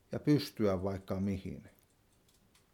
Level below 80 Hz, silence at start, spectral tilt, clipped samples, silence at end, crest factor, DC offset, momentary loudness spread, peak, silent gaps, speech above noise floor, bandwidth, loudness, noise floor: -64 dBFS; 0.1 s; -7.5 dB/octave; under 0.1%; 1.05 s; 18 dB; under 0.1%; 13 LU; -18 dBFS; none; 35 dB; 17.5 kHz; -34 LUFS; -69 dBFS